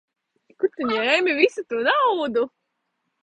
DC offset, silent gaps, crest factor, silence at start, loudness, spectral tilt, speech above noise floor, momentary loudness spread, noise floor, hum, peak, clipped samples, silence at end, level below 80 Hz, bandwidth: under 0.1%; none; 20 dB; 0.6 s; -21 LUFS; -3.5 dB/octave; 55 dB; 8 LU; -76 dBFS; none; -4 dBFS; under 0.1%; 0.75 s; -70 dBFS; 9.6 kHz